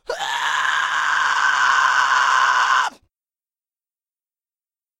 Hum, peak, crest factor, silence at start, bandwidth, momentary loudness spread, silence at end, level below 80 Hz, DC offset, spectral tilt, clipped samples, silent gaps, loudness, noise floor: none; -4 dBFS; 16 dB; 0.1 s; 16 kHz; 5 LU; 2.1 s; -66 dBFS; under 0.1%; 2 dB/octave; under 0.1%; none; -17 LUFS; under -90 dBFS